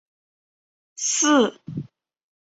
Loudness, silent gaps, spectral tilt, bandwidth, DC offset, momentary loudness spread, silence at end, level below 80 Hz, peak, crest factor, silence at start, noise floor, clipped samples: -20 LUFS; none; -2.5 dB/octave; 8.2 kHz; under 0.1%; 18 LU; 0.7 s; -68 dBFS; -8 dBFS; 18 dB; 1 s; under -90 dBFS; under 0.1%